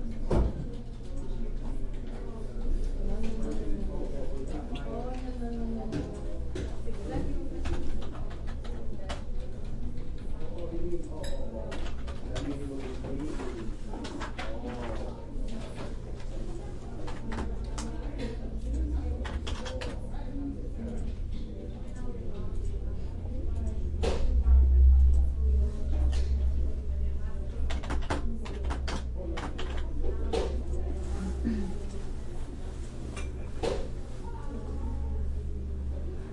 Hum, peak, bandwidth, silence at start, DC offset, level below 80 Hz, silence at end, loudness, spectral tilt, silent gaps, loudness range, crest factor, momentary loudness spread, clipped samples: none; -12 dBFS; 11 kHz; 0 s; under 0.1%; -32 dBFS; 0 s; -35 LUFS; -7 dB/octave; none; 12 LU; 18 dB; 11 LU; under 0.1%